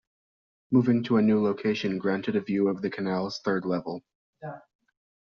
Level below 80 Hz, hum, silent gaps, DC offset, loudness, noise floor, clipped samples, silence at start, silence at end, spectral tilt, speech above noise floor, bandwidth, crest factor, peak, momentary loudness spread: -68 dBFS; none; 4.15-4.33 s; under 0.1%; -26 LUFS; under -90 dBFS; under 0.1%; 0.7 s; 0.8 s; -6 dB/octave; over 64 dB; 7 kHz; 18 dB; -10 dBFS; 18 LU